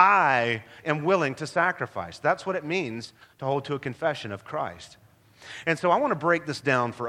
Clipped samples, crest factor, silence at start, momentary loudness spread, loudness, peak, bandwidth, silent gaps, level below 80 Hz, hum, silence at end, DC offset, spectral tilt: under 0.1%; 22 dB; 0 s; 11 LU; -26 LUFS; -4 dBFS; 14 kHz; none; -66 dBFS; none; 0 s; under 0.1%; -5.5 dB/octave